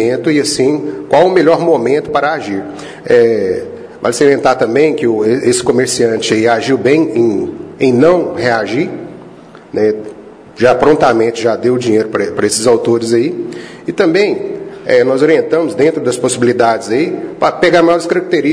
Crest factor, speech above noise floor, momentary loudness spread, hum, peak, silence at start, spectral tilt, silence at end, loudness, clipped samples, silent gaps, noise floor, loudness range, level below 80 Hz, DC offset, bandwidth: 12 dB; 24 dB; 11 LU; none; 0 dBFS; 0 s; -5 dB/octave; 0 s; -12 LUFS; 0.2%; none; -35 dBFS; 2 LU; -50 dBFS; under 0.1%; 11 kHz